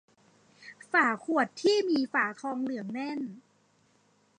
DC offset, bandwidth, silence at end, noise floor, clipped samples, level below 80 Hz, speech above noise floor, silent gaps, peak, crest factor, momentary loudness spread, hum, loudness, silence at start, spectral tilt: under 0.1%; 10 kHz; 1 s; -67 dBFS; under 0.1%; -86 dBFS; 39 dB; none; -10 dBFS; 20 dB; 13 LU; none; -29 LUFS; 0.6 s; -4 dB/octave